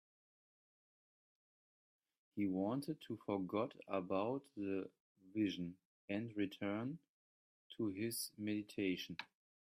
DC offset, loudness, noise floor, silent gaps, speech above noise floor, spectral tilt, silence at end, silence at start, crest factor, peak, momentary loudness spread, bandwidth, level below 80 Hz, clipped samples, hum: under 0.1%; -43 LUFS; under -90 dBFS; 5.00-5.15 s, 5.85-6.08 s, 7.09-7.70 s; over 48 dB; -5.5 dB/octave; 0.35 s; 2.35 s; 18 dB; -26 dBFS; 10 LU; 15 kHz; -84 dBFS; under 0.1%; none